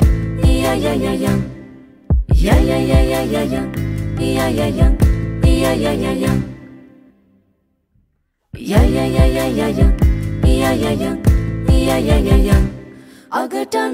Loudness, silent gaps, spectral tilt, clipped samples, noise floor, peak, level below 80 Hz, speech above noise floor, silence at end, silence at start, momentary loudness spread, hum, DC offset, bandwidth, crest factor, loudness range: -16 LUFS; none; -6.5 dB/octave; under 0.1%; -65 dBFS; -2 dBFS; -20 dBFS; 50 dB; 0 s; 0 s; 8 LU; none; 0.2%; 16 kHz; 14 dB; 5 LU